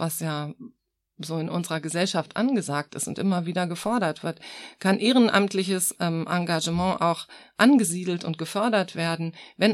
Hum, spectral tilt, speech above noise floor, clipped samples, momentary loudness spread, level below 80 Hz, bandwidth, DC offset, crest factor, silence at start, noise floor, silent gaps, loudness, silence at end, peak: none; -4.5 dB/octave; 38 dB; under 0.1%; 13 LU; -62 dBFS; 16 kHz; under 0.1%; 20 dB; 0 s; -63 dBFS; none; -25 LUFS; 0 s; -6 dBFS